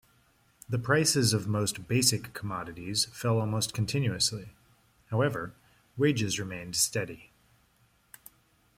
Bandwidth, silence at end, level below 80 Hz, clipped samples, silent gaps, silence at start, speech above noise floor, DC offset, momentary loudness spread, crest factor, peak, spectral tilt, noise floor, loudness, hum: 16.5 kHz; 1.55 s; -62 dBFS; under 0.1%; none; 0.7 s; 38 dB; under 0.1%; 12 LU; 22 dB; -8 dBFS; -4 dB/octave; -67 dBFS; -29 LUFS; none